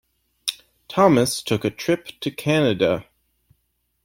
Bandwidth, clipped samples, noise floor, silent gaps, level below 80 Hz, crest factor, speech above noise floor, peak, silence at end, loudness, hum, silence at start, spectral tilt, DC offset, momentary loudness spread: 16.5 kHz; under 0.1%; -71 dBFS; none; -56 dBFS; 18 dB; 51 dB; -4 dBFS; 1.05 s; -21 LUFS; none; 0.45 s; -5 dB/octave; under 0.1%; 12 LU